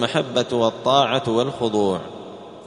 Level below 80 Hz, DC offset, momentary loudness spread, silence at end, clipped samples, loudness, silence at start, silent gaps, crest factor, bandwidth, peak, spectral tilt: -58 dBFS; under 0.1%; 17 LU; 0 s; under 0.1%; -20 LUFS; 0 s; none; 18 dB; 10.5 kHz; -2 dBFS; -5 dB/octave